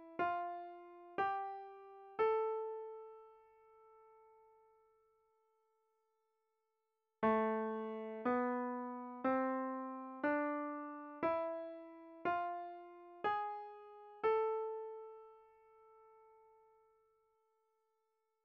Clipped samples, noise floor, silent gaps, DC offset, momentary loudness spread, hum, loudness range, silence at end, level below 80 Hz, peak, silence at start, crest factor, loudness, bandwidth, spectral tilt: under 0.1%; -88 dBFS; none; under 0.1%; 18 LU; none; 7 LU; 2.35 s; -82 dBFS; -24 dBFS; 0 s; 18 dB; -40 LUFS; 5.6 kHz; -4 dB/octave